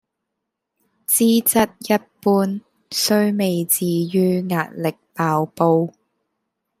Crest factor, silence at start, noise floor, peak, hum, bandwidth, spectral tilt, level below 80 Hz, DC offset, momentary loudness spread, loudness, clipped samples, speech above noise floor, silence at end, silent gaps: 18 dB; 1.1 s; -80 dBFS; -2 dBFS; none; 16 kHz; -4.5 dB/octave; -62 dBFS; under 0.1%; 10 LU; -19 LUFS; under 0.1%; 61 dB; 0.9 s; none